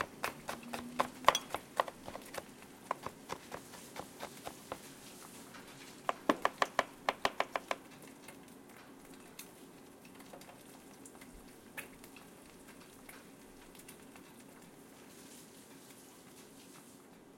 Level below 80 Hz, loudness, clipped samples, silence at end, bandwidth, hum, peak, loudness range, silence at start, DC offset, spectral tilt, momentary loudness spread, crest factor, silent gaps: -72 dBFS; -40 LUFS; under 0.1%; 0 s; 16.5 kHz; none; -10 dBFS; 16 LU; 0 s; under 0.1%; -2.5 dB/octave; 20 LU; 34 dB; none